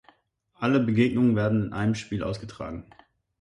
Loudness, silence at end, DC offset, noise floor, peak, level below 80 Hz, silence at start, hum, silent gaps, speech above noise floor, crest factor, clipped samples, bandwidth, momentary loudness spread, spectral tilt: -25 LUFS; 0.6 s; under 0.1%; -66 dBFS; -10 dBFS; -52 dBFS; 0.6 s; none; none; 41 dB; 16 dB; under 0.1%; 10.5 kHz; 15 LU; -7.5 dB/octave